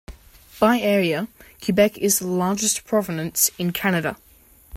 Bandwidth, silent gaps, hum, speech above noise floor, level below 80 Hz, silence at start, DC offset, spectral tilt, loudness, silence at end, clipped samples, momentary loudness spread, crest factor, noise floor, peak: 16.5 kHz; none; none; 31 dB; -52 dBFS; 0.1 s; under 0.1%; -4 dB/octave; -21 LUFS; 0 s; under 0.1%; 9 LU; 18 dB; -52 dBFS; -4 dBFS